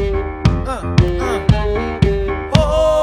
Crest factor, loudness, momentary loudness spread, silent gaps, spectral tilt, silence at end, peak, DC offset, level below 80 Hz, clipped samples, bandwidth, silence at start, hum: 16 dB; -17 LUFS; 6 LU; none; -7 dB/octave; 0 s; 0 dBFS; under 0.1%; -22 dBFS; 0.2%; 12.5 kHz; 0 s; none